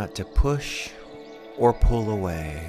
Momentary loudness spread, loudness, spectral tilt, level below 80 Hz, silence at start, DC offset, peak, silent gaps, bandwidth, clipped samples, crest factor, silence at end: 20 LU; -25 LUFS; -6 dB/octave; -28 dBFS; 0 s; under 0.1%; -6 dBFS; none; 14.5 kHz; under 0.1%; 18 dB; 0 s